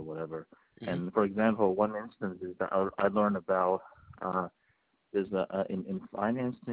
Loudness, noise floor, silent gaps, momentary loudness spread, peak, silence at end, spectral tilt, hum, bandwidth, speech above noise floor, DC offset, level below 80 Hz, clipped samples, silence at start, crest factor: -32 LUFS; -73 dBFS; none; 11 LU; -12 dBFS; 0 s; -6.5 dB/octave; none; 4 kHz; 42 dB; under 0.1%; -66 dBFS; under 0.1%; 0 s; 20 dB